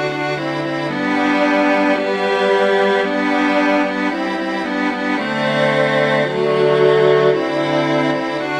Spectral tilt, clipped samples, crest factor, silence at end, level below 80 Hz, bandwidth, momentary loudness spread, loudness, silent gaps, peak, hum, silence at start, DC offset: -6 dB/octave; under 0.1%; 16 dB; 0 s; -58 dBFS; 11 kHz; 7 LU; -16 LUFS; none; 0 dBFS; none; 0 s; under 0.1%